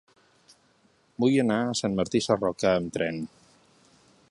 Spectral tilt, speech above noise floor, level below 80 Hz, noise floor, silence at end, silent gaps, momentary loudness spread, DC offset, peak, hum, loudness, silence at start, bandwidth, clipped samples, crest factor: -5 dB/octave; 39 dB; -60 dBFS; -64 dBFS; 1.05 s; none; 11 LU; under 0.1%; -8 dBFS; none; -26 LUFS; 1.2 s; 11.5 kHz; under 0.1%; 20 dB